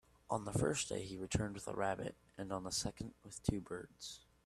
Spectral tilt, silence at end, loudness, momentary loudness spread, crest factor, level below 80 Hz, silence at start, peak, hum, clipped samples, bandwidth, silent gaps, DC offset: -4.5 dB/octave; 0.25 s; -42 LUFS; 13 LU; 24 dB; -58 dBFS; 0.3 s; -18 dBFS; none; under 0.1%; 14 kHz; none; under 0.1%